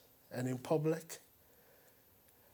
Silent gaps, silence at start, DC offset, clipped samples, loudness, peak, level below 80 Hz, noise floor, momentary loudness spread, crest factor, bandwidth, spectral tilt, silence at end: none; 0.3 s; under 0.1%; under 0.1%; -39 LUFS; -20 dBFS; -82 dBFS; -67 dBFS; 15 LU; 22 dB; over 20 kHz; -6.5 dB/octave; 1.35 s